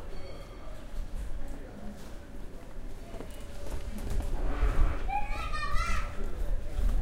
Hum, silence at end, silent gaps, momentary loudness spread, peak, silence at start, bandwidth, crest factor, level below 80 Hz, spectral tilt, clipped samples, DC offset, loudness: none; 0 s; none; 14 LU; -10 dBFS; 0 s; 12.5 kHz; 20 dB; -32 dBFS; -5.5 dB/octave; under 0.1%; under 0.1%; -38 LUFS